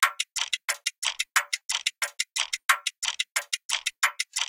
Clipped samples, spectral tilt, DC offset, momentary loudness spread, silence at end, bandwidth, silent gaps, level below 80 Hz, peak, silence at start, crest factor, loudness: under 0.1%; 6.5 dB/octave; under 0.1%; 4 LU; 0.05 s; 17 kHz; 0.98-1.02 s, 1.65-1.69 s, 2.65-2.69 s, 2.98-3.02 s, 3.65-3.69 s; -72 dBFS; -6 dBFS; 0 s; 24 dB; -27 LUFS